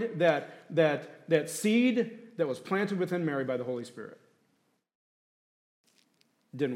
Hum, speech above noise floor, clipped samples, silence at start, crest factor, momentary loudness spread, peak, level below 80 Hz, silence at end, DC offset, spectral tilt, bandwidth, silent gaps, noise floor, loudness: none; 44 dB; under 0.1%; 0 s; 20 dB; 12 LU; -12 dBFS; -86 dBFS; 0 s; under 0.1%; -5.5 dB/octave; 16 kHz; 4.95-5.84 s; -74 dBFS; -30 LUFS